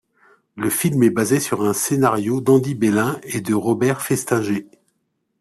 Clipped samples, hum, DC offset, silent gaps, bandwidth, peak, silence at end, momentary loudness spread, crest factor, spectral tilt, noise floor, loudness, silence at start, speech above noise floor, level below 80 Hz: under 0.1%; none; under 0.1%; none; 14.5 kHz; -4 dBFS; 0.75 s; 6 LU; 16 dB; -5.5 dB/octave; -71 dBFS; -19 LUFS; 0.55 s; 53 dB; -58 dBFS